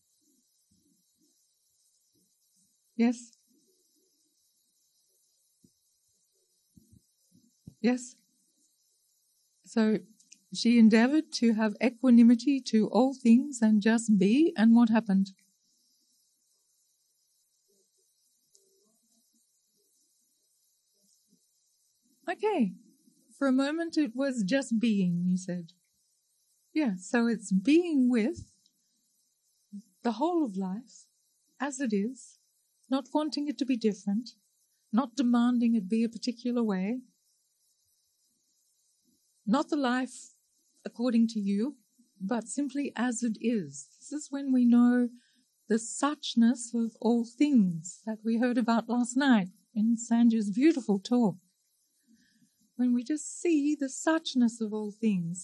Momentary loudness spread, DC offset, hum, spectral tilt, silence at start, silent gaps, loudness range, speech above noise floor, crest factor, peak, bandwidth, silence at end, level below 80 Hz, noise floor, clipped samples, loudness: 14 LU; under 0.1%; none; -5.5 dB/octave; 3 s; none; 13 LU; 47 dB; 20 dB; -10 dBFS; 10.5 kHz; 0 s; -76 dBFS; -74 dBFS; under 0.1%; -28 LUFS